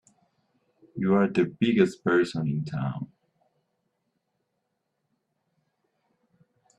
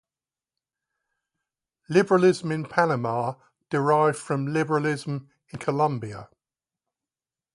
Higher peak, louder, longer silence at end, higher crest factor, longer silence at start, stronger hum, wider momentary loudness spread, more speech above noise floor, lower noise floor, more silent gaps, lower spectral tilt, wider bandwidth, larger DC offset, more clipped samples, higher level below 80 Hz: about the same, -6 dBFS vs -4 dBFS; about the same, -25 LUFS vs -24 LUFS; first, 3.75 s vs 1.3 s; about the same, 24 dB vs 22 dB; second, 0.95 s vs 1.9 s; neither; about the same, 13 LU vs 14 LU; second, 55 dB vs over 66 dB; second, -79 dBFS vs under -90 dBFS; neither; about the same, -7.5 dB/octave vs -6.5 dB/octave; second, 10 kHz vs 11.5 kHz; neither; neither; about the same, -68 dBFS vs -68 dBFS